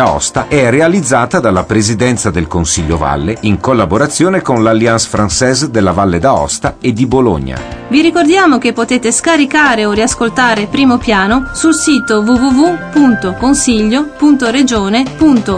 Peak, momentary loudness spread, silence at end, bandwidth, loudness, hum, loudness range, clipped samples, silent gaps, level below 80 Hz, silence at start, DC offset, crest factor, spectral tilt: 0 dBFS; 5 LU; 0 s; 11 kHz; -10 LUFS; none; 2 LU; under 0.1%; none; -30 dBFS; 0 s; under 0.1%; 10 dB; -4.5 dB/octave